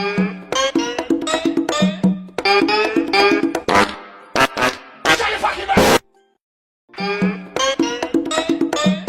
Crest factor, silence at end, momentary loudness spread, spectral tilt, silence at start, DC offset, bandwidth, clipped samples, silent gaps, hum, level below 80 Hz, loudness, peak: 16 dB; 0 s; 7 LU; -4 dB/octave; 0 s; under 0.1%; 17 kHz; under 0.1%; 6.41-6.88 s; none; -46 dBFS; -17 LUFS; -2 dBFS